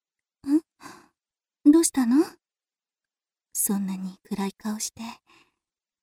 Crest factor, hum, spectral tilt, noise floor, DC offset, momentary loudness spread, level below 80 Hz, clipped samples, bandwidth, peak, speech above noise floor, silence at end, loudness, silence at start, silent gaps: 20 dB; none; -4.5 dB/octave; under -90 dBFS; under 0.1%; 16 LU; -68 dBFS; under 0.1%; 18 kHz; -6 dBFS; over 63 dB; 0.9 s; -25 LUFS; 0.45 s; none